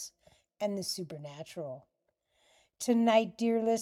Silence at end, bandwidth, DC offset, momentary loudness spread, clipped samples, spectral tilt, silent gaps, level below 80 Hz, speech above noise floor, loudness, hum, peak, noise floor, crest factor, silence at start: 0 s; 15.5 kHz; under 0.1%; 18 LU; under 0.1%; -4.5 dB/octave; none; -78 dBFS; 46 dB; -31 LUFS; none; -12 dBFS; -77 dBFS; 20 dB; 0 s